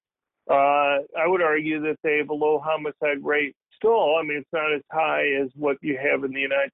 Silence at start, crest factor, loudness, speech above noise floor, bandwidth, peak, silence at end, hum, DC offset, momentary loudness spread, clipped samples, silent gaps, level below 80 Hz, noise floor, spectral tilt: 0.5 s; 14 dB; -23 LUFS; 20 dB; 3.9 kHz; -10 dBFS; 0.05 s; none; under 0.1%; 6 LU; under 0.1%; none; -68 dBFS; -43 dBFS; -8.5 dB/octave